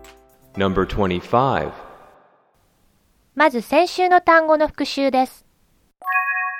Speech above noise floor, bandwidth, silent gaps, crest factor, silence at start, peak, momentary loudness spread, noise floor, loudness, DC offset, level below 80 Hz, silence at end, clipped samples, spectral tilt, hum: 43 dB; 16 kHz; none; 18 dB; 0.55 s; -2 dBFS; 15 LU; -61 dBFS; -18 LUFS; under 0.1%; -44 dBFS; 0 s; under 0.1%; -5.5 dB/octave; none